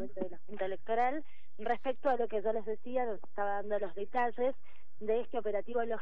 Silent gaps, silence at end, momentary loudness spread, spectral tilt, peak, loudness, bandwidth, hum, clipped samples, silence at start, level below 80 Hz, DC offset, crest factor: none; 0 s; 10 LU; -7.5 dB/octave; -18 dBFS; -36 LUFS; 6.2 kHz; none; under 0.1%; 0 s; -72 dBFS; 2%; 16 dB